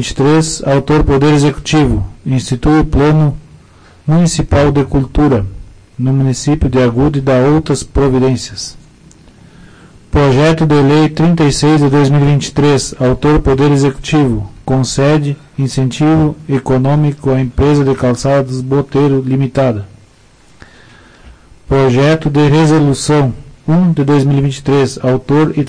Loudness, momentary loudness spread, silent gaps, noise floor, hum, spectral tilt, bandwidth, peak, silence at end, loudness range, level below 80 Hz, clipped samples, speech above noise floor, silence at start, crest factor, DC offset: -11 LUFS; 7 LU; none; -45 dBFS; none; -6.5 dB/octave; 10.5 kHz; -2 dBFS; 0 s; 4 LU; -26 dBFS; under 0.1%; 34 dB; 0 s; 8 dB; under 0.1%